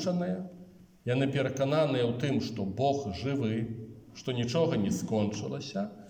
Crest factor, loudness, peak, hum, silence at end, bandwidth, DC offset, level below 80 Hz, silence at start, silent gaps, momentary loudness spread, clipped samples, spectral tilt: 16 dB; -31 LUFS; -16 dBFS; none; 0 s; 17 kHz; under 0.1%; -64 dBFS; 0 s; none; 11 LU; under 0.1%; -6.5 dB/octave